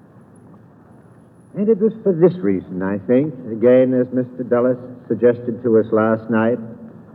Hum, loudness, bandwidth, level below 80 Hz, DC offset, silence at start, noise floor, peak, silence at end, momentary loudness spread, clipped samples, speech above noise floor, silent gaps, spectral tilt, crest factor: none; -18 LUFS; 4.2 kHz; -66 dBFS; under 0.1%; 1.55 s; -46 dBFS; -2 dBFS; 0.25 s; 11 LU; under 0.1%; 29 dB; none; -11 dB/octave; 16 dB